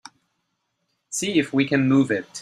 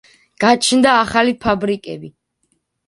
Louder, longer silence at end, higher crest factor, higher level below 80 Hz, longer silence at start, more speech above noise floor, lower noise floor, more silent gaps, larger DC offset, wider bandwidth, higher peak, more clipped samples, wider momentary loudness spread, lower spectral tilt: second, -21 LUFS vs -15 LUFS; second, 0 s vs 0.8 s; about the same, 18 dB vs 16 dB; second, -64 dBFS vs -48 dBFS; first, 1.1 s vs 0.4 s; about the same, 54 dB vs 52 dB; first, -75 dBFS vs -67 dBFS; neither; neither; first, 13.5 kHz vs 11.5 kHz; second, -6 dBFS vs 0 dBFS; neither; second, 8 LU vs 14 LU; first, -5 dB/octave vs -3.5 dB/octave